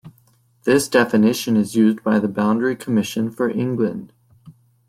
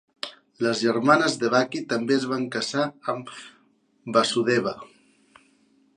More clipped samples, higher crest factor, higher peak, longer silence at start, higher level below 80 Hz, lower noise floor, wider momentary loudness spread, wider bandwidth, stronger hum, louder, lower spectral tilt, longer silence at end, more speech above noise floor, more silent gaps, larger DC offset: neither; about the same, 18 dB vs 22 dB; about the same, -2 dBFS vs -4 dBFS; second, 0.05 s vs 0.25 s; first, -62 dBFS vs -72 dBFS; second, -58 dBFS vs -63 dBFS; second, 7 LU vs 17 LU; first, 16 kHz vs 11.5 kHz; neither; first, -19 LUFS vs -24 LUFS; about the same, -5.5 dB/octave vs -4.5 dB/octave; second, 0.35 s vs 1.1 s; about the same, 39 dB vs 40 dB; neither; neither